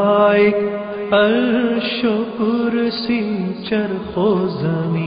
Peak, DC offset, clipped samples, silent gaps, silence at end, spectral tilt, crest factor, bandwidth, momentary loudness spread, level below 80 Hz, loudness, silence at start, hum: -4 dBFS; under 0.1%; under 0.1%; none; 0 s; -11.5 dB/octave; 14 dB; 5.2 kHz; 8 LU; -52 dBFS; -18 LUFS; 0 s; none